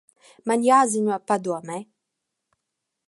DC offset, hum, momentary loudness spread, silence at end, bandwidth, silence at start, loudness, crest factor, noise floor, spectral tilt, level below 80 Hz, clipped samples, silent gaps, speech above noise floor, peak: under 0.1%; none; 17 LU; 1.25 s; 11.5 kHz; 0.45 s; -22 LUFS; 20 dB; -82 dBFS; -4.5 dB/octave; -78 dBFS; under 0.1%; none; 60 dB; -4 dBFS